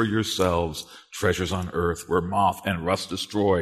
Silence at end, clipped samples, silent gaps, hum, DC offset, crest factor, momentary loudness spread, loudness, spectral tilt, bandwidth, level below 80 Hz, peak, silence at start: 0 s; under 0.1%; none; none; under 0.1%; 18 dB; 5 LU; -25 LUFS; -5 dB/octave; 13.5 kHz; -46 dBFS; -8 dBFS; 0 s